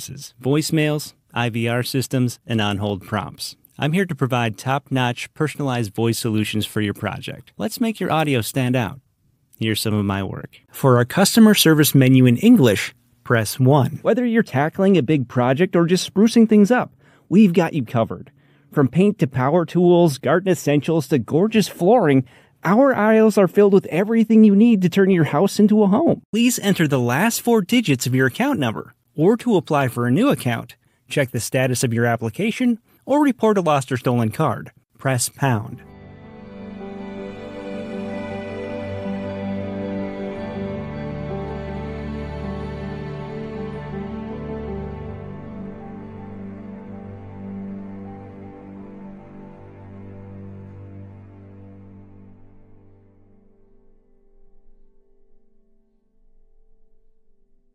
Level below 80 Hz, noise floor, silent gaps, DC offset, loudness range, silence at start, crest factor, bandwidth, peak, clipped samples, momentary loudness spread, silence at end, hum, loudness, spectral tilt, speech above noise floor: -48 dBFS; -63 dBFS; 26.25-26.33 s; under 0.1%; 17 LU; 0 s; 16 dB; 16 kHz; -2 dBFS; under 0.1%; 21 LU; 5.75 s; none; -19 LUFS; -6 dB/octave; 46 dB